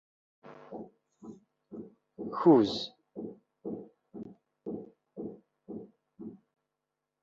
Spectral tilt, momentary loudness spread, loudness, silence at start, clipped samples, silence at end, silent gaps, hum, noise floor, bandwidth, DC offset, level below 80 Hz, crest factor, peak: -6 dB/octave; 27 LU; -30 LUFS; 0.45 s; under 0.1%; 0.85 s; none; none; -87 dBFS; 7.4 kHz; under 0.1%; -74 dBFS; 24 dB; -12 dBFS